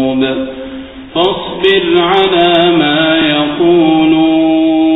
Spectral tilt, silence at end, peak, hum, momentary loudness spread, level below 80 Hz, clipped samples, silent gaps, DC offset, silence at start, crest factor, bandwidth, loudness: -7.5 dB/octave; 0 s; 0 dBFS; none; 11 LU; -42 dBFS; under 0.1%; none; under 0.1%; 0 s; 10 dB; 4 kHz; -10 LUFS